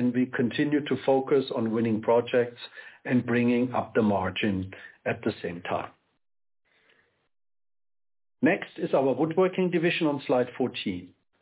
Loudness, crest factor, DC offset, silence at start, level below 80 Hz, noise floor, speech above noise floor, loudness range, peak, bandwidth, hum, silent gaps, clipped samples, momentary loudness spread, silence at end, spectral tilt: -27 LUFS; 16 dB; under 0.1%; 0 s; -60 dBFS; -66 dBFS; 40 dB; 10 LU; -12 dBFS; 4 kHz; none; none; under 0.1%; 10 LU; 0.35 s; -10.5 dB/octave